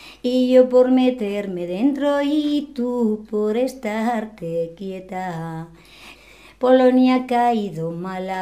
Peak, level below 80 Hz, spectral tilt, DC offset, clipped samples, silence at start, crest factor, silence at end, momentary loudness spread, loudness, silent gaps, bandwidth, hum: -2 dBFS; -56 dBFS; -6.5 dB/octave; under 0.1%; under 0.1%; 0 s; 18 dB; 0 s; 14 LU; -20 LUFS; none; 14.5 kHz; none